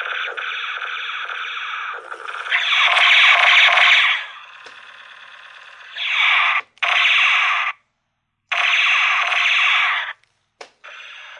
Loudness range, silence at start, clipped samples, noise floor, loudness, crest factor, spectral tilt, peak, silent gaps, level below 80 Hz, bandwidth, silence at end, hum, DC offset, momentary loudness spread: 4 LU; 0 s; under 0.1%; -73 dBFS; -15 LUFS; 16 dB; 4 dB/octave; -2 dBFS; none; -82 dBFS; 11 kHz; 0 s; 60 Hz at -80 dBFS; under 0.1%; 18 LU